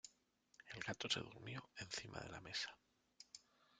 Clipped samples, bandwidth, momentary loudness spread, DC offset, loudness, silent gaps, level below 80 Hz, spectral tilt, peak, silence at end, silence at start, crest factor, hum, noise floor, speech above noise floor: under 0.1%; 10.5 kHz; 19 LU; under 0.1%; -48 LUFS; none; -76 dBFS; -2.5 dB/octave; -24 dBFS; 0.4 s; 0.05 s; 26 dB; none; -78 dBFS; 29 dB